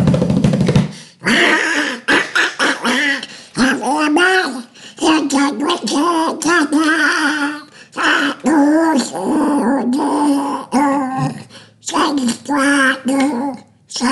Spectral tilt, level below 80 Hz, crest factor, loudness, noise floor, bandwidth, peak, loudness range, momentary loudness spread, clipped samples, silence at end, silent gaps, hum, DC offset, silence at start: -4.5 dB/octave; -48 dBFS; 14 dB; -15 LUFS; -38 dBFS; 12 kHz; -2 dBFS; 2 LU; 10 LU; under 0.1%; 0 s; none; none; under 0.1%; 0 s